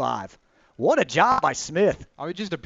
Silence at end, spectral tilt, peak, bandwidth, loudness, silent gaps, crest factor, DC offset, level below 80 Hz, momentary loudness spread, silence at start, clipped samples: 0.05 s; -4.5 dB/octave; -4 dBFS; 8 kHz; -23 LUFS; none; 20 dB; under 0.1%; -54 dBFS; 14 LU; 0 s; under 0.1%